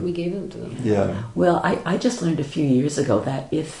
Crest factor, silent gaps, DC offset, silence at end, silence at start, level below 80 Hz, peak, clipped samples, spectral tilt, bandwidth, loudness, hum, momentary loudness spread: 16 dB; none; under 0.1%; 0 s; 0 s; -52 dBFS; -6 dBFS; under 0.1%; -6.5 dB/octave; 11 kHz; -22 LUFS; none; 8 LU